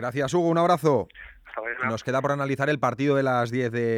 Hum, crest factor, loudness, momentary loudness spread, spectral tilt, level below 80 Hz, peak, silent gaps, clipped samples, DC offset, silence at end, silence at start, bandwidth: none; 16 dB; -24 LUFS; 10 LU; -6.5 dB/octave; -60 dBFS; -8 dBFS; none; under 0.1%; under 0.1%; 0 s; 0 s; 15.5 kHz